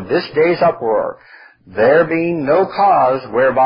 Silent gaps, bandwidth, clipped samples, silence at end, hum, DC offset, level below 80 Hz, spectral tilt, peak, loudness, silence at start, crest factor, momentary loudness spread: none; 5.4 kHz; under 0.1%; 0 s; none; under 0.1%; -54 dBFS; -11 dB/octave; 0 dBFS; -14 LUFS; 0 s; 14 dB; 6 LU